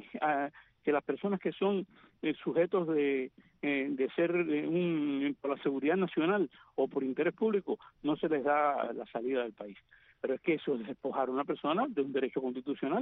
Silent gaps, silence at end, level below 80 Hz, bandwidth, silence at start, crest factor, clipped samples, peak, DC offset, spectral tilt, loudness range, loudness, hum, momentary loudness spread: none; 0 s; -76 dBFS; 4 kHz; 0 s; 16 dB; under 0.1%; -18 dBFS; under 0.1%; -5 dB/octave; 3 LU; -33 LUFS; none; 7 LU